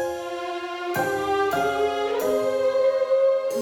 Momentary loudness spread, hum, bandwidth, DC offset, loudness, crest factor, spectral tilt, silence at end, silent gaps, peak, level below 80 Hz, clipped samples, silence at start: 9 LU; none; 17.5 kHz; under 0.1%; -23 LUFS; 12 dB; -4 dB/octave; 0 s; none; -10 dBFS; -58 dBFS; under 0.1%; 0 s